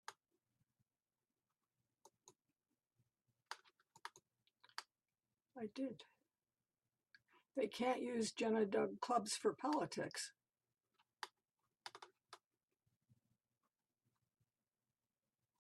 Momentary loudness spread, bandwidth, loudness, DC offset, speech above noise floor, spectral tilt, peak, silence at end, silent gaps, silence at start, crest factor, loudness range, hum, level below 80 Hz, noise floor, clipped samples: 19 LU; 12.5 kHz; -42 LUFS; under 0.1%; over 48 dB; -3.5 dB/octave; -26 dBFS; 3.25 s; none; 0.1 s; 22 dB; 21 LU; none; under -90 dBFS; under -90 dBFS; under 0.1%